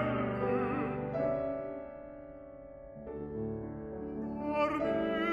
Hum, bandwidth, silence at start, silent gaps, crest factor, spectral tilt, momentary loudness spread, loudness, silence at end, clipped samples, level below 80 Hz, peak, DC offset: none; 11.5 kHz; 0 s; none; 16 dB; -8.5 dB/octave; 17 LU; -35 LUFS; 0 s; under 0.1%; -56 dBFS; -18 dBFS; under 0.1%